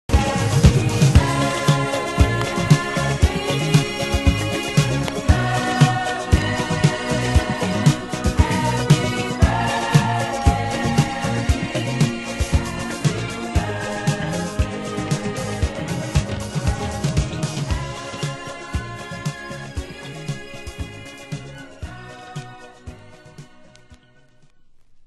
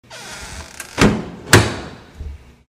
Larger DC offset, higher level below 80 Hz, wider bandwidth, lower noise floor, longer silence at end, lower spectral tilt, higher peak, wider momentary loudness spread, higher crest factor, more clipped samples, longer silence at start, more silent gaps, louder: neither; first, -28 dBFS vs -34 dBFS; second, 12.5 kHz vs 16 kHz; first, -51 dBFS vs -34 dBFS; second, 0.05 s vs 0.35 s; first, -5.5 dB/octave vs -4 dB/octave; about the same, 0 dBFS vs 0 dBFS; second, 16 LU vs 22 LU; about the same, 20 dB vs 20 dB; neither; about the same, 0.1 s vs 0.1 s; neither; second, -20 LUFS vs -15 LUFS